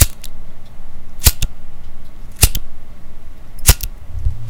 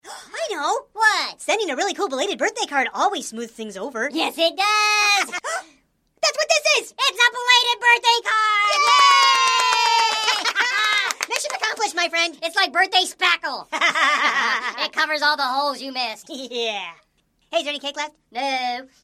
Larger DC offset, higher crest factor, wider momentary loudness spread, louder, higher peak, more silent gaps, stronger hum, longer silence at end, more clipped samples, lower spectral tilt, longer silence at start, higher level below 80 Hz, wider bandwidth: neither; about the same, 16 dB vs 20 dB; first, 26 LU vs 13 LU; about the same, -17 LUFS vs -19 LUFS; about the same, 0 dBFS vs 0 dBFS; neither; neither; second, 0 s vs 0.2 s; first, 0.4% vs under 0.1%; first, -2.5 dB/octave vs 1 dB/octave; about the same, 0 s vs 0.05 s; first, -22 dBFS vs -72 dBFS; first, 19 kHz vs 16 kHz